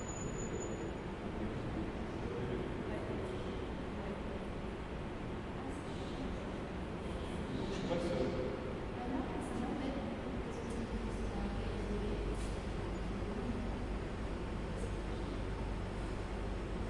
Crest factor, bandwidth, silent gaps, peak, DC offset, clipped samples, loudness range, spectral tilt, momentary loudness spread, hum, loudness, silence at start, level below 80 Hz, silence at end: 16 dB; 11.5 kHz; none; -24 dBFS; under 0.1%; under 0.1%; 3 LU; -6 dB/octave; 4 LU; none; -41 LUFS; 0 s; -46 dBFS; 0 s